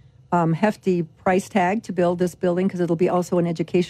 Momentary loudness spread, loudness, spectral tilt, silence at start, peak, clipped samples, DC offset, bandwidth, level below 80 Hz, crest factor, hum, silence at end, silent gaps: 3 LU; -22 LUFS; -7 dB/octave; 0.3 s; -8 dBFS; under 0.1%; under 0.1%; 13.5 kHz; -58 dBFS; 14 dB; none; 0 s; none